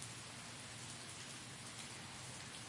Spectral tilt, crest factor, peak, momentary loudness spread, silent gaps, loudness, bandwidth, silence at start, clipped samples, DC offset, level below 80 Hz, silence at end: -2 dB/octave; 24 dB; -28 dBFS; 1 LU; none; -49 LUFS; 11.5 kHz; 0 s; under 0.1%; under 0.1%; -76 dBFS; 0 s